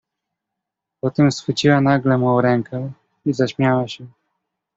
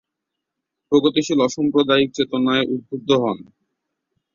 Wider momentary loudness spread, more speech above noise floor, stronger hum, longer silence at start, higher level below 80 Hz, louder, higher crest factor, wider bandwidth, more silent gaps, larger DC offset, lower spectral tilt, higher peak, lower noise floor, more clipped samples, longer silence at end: first, 13 LU vs 8 LU; about the same, 65 dB vs 63 dB; neither; first, 1.05 s vs 0.9 s; about the same, -56 dBFS vs -60 dBFS; about the same, -18 LUFS vs -19 LUFS; about the same, 18 dB vs 18 dB; about the same, 7.8 kHz vs 7.6 kHz; neither; neither; first, -6.5 dB/octave vs -5 dB/octave; about the same, -2 dBFS vs -2 dBFS; about the same, -82 dBFS vs -81 dBFS; neither; second, 0.7 s vs 0.95 s